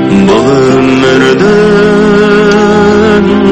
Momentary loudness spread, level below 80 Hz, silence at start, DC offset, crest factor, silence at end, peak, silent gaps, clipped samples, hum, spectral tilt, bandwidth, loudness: 1 LU; -32 dBFS; 0 s; under 0.1%; 6 dB; 0 s; 0 dBFS; none; 3%; none; -6 dB/octave; 8.8 kHz; -6 LUFS